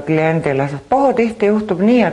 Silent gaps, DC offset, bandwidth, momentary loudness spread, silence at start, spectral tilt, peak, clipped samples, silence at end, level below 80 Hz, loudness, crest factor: none; under 0.1%; 10.5 kHz; 4 LU; 0 s; -8 dB/octave; -2 dBFS; under 0.1%; 0 s; -48 dBFS; -15 LUFS; 12 dB